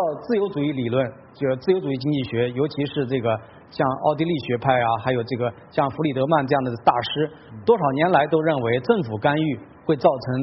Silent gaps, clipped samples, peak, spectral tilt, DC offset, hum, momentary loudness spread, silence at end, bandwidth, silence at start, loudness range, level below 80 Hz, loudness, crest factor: none; under 0.1%; -2 dBFS; -5 dB/octave; under 0.1%; none; 7 LU; 0 s; 5.8 kHz; 0 s; 3 LU; -58 dBFS; -22 LUFS; 18 dB